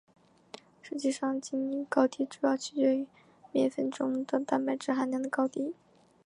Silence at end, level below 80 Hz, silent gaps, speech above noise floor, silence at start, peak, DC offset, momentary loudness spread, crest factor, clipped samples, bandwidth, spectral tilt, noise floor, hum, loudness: 0.5 s; -82 dBFS; none; 23 dB; 0.85 s; -10 dBFS; under 0.1%; 14 LU; 22 dB; under 0.1%; 11 kHz; -4.5 dB/octave; -53 dBFS; none; -31 LUFS